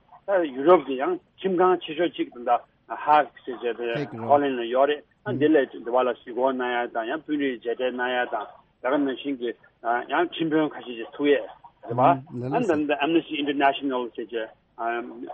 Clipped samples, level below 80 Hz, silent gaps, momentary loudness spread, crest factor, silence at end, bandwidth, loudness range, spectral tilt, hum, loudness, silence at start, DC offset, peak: under 0.1%; -70 dBFS; none; 11 LU; 20 dB; 0 s; 8 kHz; 3 LU; -7.5 dB/octave; none; -25 LUFS; 0.1 s; under 0.1%; -4 dBFS